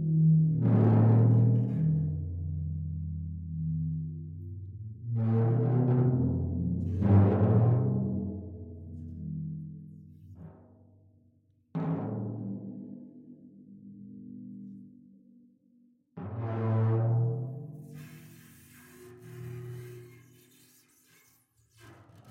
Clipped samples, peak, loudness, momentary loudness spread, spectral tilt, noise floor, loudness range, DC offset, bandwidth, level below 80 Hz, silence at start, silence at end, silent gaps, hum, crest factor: under 0.1%; -12 dBFS; -28 LUFS; 24 LU; -11 dB/octave; -67 dBFS; 21 LU; under 0.1%; 3.2 kHz; -60 dBFS; 0 s; 0 s; none; none; 18 dB